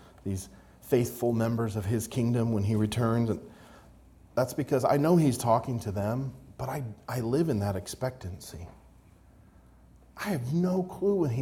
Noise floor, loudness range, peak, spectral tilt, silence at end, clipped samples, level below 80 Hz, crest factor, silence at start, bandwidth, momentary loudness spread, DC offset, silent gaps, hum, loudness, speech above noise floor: -56 dBFS; 7 LU; -12 dBFS; -7 dB/octave; 0 s; under 0.1%; -56 dBFS; 18 dB; 0 s; 18.5 kHz; 14 LU; under 0.1%; none; none; -29 LUFS; 28 dB